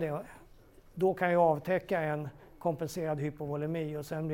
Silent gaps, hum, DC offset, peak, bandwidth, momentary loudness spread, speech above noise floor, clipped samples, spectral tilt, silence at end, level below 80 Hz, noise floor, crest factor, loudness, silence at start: none; none; under 0.1%; -14 dBFS; 16.5 kHz; 12 LU; 25 dB; under 0.1%; -7 dB/octave; 0 s; -62 dBFS; -57 dBFS; 18 dB; -32 LUFS; 0 s